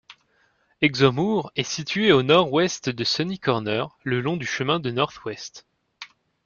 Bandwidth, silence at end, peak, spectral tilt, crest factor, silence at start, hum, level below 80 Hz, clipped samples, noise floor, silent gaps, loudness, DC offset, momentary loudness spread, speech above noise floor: 7.2 kHz; 0.4 s; -2 dBFS; -5 dB/octave; 20 dB; 0.1 s; none; -60 dBFS; under 0.1%; -65 dBFS; none; -22 LUFS; under 0.1%; 17 LU; 42 dB